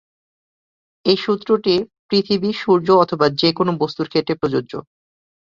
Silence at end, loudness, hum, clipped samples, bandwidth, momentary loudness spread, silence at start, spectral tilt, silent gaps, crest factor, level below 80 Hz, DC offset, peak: 0.75 s; -18 LUFS; none; under 0.1%; 7.4 kHz; 8 LU; 1.05 s; -7 dB/octave; 1.99-2.09 s; 18 dB; -58 dBFS; under 0.1%; -2 dBFS